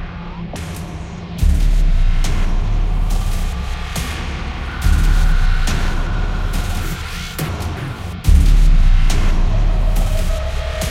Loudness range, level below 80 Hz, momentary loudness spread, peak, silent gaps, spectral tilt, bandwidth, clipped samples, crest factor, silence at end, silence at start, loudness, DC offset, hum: 3 LU; -16 dBFS; 11 LU; 0 dBFS; none; -5 dB/octave; 14.5 kHz; under 0.1%; 14 dB; 0 s; 0 s; -20 LUFS; under 0.1%; none